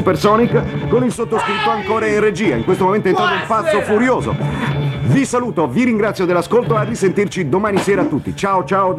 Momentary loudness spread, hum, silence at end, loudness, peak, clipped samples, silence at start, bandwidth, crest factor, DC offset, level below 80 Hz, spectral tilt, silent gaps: 4 LU; none; 0 s; -16 LUFS; 0 dBFS; under 0.1%; 0 s; 14 kHz; 14 dB; under 0.1%; -42 dBFS; -6 dB/octave; none